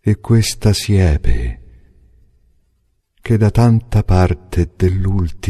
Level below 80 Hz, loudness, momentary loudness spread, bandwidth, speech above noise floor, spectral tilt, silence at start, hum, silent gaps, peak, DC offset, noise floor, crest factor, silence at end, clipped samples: -24 dBFS; -15 LUFS; 9 LU; 13.5 kHz; 49 dB; -6.5 dB/octave; 0.05 s; none; none; 0 dBFS; under 0.1%; -62 dBFS; 16 dB; 0 s; under 0.1%